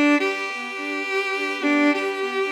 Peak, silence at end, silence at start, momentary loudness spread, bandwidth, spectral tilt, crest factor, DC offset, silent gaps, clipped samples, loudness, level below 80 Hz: -8 dBFS; 0 s; 0 s; 8 LU; 12.5 kHz; -2 dB/octave; 14 dB; under 0.1%; none; under 0.1%; -22 LUFS; under -90 dBFS